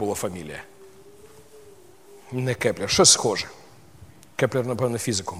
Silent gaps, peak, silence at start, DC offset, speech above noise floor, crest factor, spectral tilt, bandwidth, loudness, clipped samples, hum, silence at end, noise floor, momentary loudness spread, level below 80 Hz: none; -2 dBFS; 0 s; 0.2%; 27 dB; 24 dB; -3 dB/octave; 16 kHz; -21 LUFS; under 0.1%; none; 0 s; -50 dBFS; 21 LU; -56 dBFS